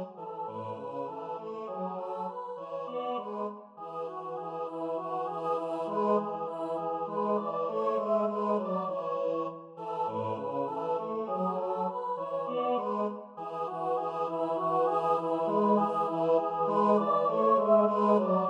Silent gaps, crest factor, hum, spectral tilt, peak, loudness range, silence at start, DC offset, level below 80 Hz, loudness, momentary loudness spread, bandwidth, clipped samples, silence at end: none; 18 dB; none; -8.5 dB/octave; -12 dBFS; 10 LU; 0 s; under 0.1%; -86 dBFS; -31 LUFS; 13 LU; 9.8 kHz; under 0.1%; 0 s